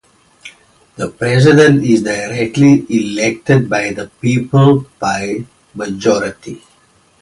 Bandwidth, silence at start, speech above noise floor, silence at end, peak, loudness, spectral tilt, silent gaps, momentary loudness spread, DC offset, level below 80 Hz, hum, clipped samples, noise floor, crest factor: 11.5 kHz; 0.45 s; 39 dB; 0.65 s; 0 dBFS; -13 LUFS; -6.5 dB/octave; none; 16 LU; under 0.1%; -48 dBFS; none; under 0.1%; -52 dBFS; 14 dB